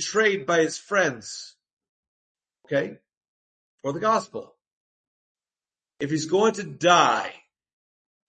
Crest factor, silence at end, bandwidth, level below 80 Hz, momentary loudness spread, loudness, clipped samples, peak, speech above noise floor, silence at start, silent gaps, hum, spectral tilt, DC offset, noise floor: 22 dB; 0.9 s; 8.8 kHz; -72 dBFS; 18 LU; -23 LUFS; under 0.1%; -4 dBFS; over 67 dB; 0 s; 1.73-1.77 s, 1.89-2.35 s, 3.17-3.21 s, 3.28-3.78 s, 4.72-5.35 s; none; -3.5 dB/octave; under 0.1%; under -90 dBFS